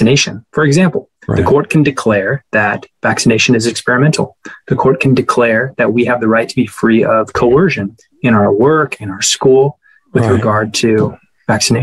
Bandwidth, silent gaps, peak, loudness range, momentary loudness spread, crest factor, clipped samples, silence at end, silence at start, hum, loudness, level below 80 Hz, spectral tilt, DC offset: 12.5 kHz; none; 0 dBFS; 1 LU; 8 LU; 12 dB; under 0.1%; 0 s; 0 s; none; -12 LUFS; -46 dBFS; -5 dB/octave; under 0.1%